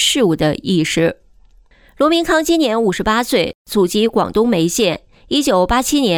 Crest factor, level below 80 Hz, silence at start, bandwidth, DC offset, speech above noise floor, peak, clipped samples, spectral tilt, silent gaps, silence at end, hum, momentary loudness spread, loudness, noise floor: 12 dB; -38 dBFS; 0 s; 19.5 kHz; under 0.1%; 33 dB; -2 dBFS; under 0.1%; -4 dB/octave; 3.55-3.65 s; 0 s; none; 4 LU; -15 LUFS; -48 dBFS